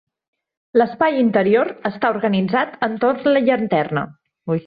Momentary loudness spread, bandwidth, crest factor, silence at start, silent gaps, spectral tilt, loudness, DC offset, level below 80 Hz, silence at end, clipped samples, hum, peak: 8 LU; 5 kHz; 16 dB; 0.75 s; none; -10 dB/octave; -18 LUFS; under 0.1%; -62 dBFS; 0.05 s; under 0.1%; none; -4 dBFS